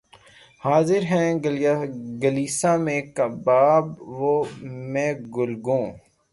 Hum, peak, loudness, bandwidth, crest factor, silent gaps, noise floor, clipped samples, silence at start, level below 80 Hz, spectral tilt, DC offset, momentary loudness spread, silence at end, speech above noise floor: none; -6 dBFS; -22 LUFS; 11.5 kHz; 16 dB; none; -51 dBFS; under 0.1%; 0.65 s; -62 dBFS; -6 dB/octave; under 0.1%; 11 LU; 0.35 s; 29 dB